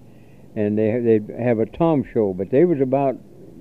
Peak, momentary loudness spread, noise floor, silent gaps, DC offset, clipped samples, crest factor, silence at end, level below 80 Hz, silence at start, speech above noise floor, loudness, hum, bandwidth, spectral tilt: -4 dBFS; 7 LU; -47 dBFS; none; 0.4%; under 0.1%; 16 dB; 0 s; -54 dBFS; 0.55 s; 28 dB; -20 LUFS; none; 4.2 kHz; -10.5 dB/octave